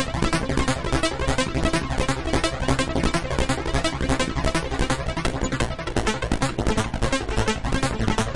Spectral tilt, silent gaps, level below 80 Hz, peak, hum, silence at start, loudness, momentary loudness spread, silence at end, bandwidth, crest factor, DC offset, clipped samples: -4.5 dB/octave; none; -30 dBFS; -6 dBFS; none; 0 s; -24 LUFS; 2 LU; 0 s; 11.5 kHz; 18 dB; under 0.1%; under 0.1%